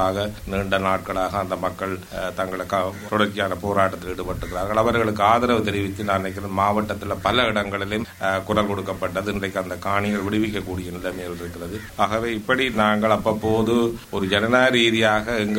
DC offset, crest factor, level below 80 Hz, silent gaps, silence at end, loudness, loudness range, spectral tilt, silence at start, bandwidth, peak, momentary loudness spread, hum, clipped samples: under 0.1%; 20 dB; -44 dBFS; none; 0 s; -22 LUFS; 5 LU; -5 dB/octave; 0 s; 16.5 kHz; -2 dBFS; 11 LU; none; under 0.1%